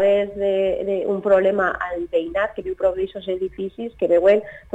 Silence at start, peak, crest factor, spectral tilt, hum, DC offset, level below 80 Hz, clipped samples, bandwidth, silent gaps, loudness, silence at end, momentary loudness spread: 0 s; -6 dBFS; 14 dB; -7 dB/octave; none; under 0.1%; -50 dBFS; under 0.1%; 7.8 kHz; none; -21 LUFS; 0.15 s; 10 LU